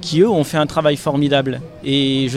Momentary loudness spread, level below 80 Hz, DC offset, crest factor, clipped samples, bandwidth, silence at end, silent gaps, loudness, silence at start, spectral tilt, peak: 5 LU; -48 dBFS; under 0.1%; 16 dB; under 0.1%; 14.5 kHz; 0 s; none; -17 LUFS; 0 s; -6 dB/octave; -2 dBFS